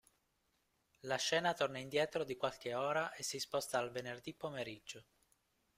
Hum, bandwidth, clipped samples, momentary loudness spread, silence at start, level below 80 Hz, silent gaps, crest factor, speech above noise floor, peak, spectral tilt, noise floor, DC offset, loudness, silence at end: none; 16 kHz; under 0.1%; 12 LU; 1.05 s; -78 dBFS; none; 20 dB; 41 dB; -22 dBFS; -3 dB/octave; -81 dBFS; under 0.1%; -39 LUFS; 0.75 s